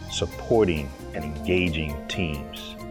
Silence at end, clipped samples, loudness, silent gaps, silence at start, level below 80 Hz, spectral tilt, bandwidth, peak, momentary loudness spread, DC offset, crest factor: 0 s; under 0.1%; -26 LUFS; none; 0 s; -40 dBFS; -5.5 dB/octave; over 20 kHz; -8 dBFS; 13 LU; under 0.1%; 18 dB